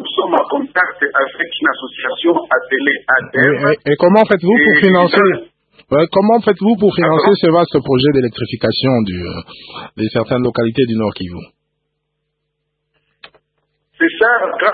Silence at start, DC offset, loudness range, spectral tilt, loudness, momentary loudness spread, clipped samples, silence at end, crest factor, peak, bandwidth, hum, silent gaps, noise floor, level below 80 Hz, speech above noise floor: 0 s; under 0.1%; 9 LU; -9 dB/octave; -13 LUFS; 11 LU; under 0.1%; 0 s; 14 dB; 0 dBFS; 4.8 kHz; none; none; -72 dBFS; -50 dBFS; 58 dB